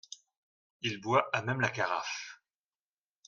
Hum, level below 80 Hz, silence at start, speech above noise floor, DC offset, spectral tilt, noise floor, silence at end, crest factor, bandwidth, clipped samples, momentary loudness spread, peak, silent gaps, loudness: none; -76 dBFS; 0.1 s; over 58 dB; under 0.1%; -4.5 dB/octave; under -90 dBFS; 0.9 s; 24 dB; 7.4 kHz; under 0.1%; 19 LU; -12 dBFS; 0.37-0.80 s; -32 LUFS